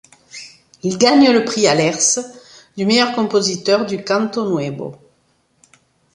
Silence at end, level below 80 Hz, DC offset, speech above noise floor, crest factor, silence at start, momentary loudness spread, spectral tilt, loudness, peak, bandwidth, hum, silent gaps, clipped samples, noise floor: 1.2 s; -60 dBFS; under 0.1%; 45 dB; 16 dB; 0.35 s; 22 LU; -3.5 dB/octave; -16 LUFS; -2 dBFS; 11.5 kHz; none; none; under 0.1%; -61 dBFS